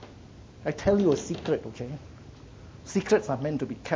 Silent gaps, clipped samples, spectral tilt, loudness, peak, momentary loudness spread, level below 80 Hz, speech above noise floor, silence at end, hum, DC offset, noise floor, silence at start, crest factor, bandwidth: none; under 0.1%; -6 dB/octave; -28 LUFS; -10 dBFS; 24 LU; -50 dBFS; 21 dB; 0 s; none; under 0.1%; -48 dBFS; 0 s; 18 dB; 8 kHz